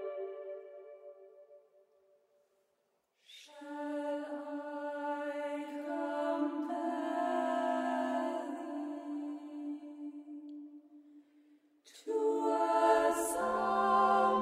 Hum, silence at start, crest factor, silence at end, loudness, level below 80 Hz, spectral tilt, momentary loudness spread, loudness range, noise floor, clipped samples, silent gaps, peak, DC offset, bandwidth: none; 0 s; 20 dB; 0 s; -34 LUFS; -74 dBFS; -4 dB/octave; 21 LU; 14 LU; -79 dBFS; under 0.1%; none; -16 dBFS; under 0.1%; 16 kHz